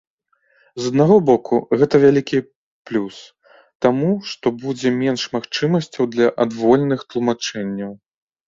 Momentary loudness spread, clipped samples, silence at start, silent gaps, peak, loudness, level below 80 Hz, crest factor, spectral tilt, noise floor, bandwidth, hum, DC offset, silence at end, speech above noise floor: 12 LU; under 0.1%; 0.75 s; 2.55-2.85 s, 3.75-3.80 s; -2 dBFS; -18 LUFS; -58 dBFS; 16 dB; -6 dB/octave; -60 dBFS; 7.8 kHz; none; under 0.1%; 0.5 s; 43 dB